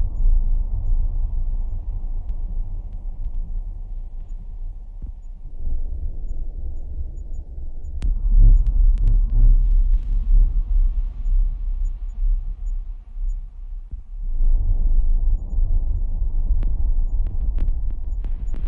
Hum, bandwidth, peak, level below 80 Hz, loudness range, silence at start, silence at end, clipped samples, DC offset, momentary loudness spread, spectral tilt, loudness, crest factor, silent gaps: none; 1 kHz; -6 dBFS; -20 dBFS; 13 LU; 0 s; 0 s; under 0.1%; under 0.1%; 16 LU; -10 dB/octave; -26 LUFS; 14 dB; none